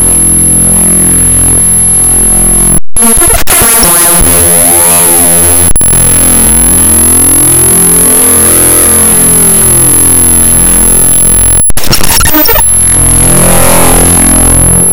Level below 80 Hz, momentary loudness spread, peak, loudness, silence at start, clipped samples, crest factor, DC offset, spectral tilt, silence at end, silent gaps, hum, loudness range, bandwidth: -16 dBFS; 2 LU; 0 dBFS; -2 LUFS; 0 s; 20%; 4 dB; under 0.1%; -2.5 dB/octave; 0 s; none; none; 1 LU; over 20 kHz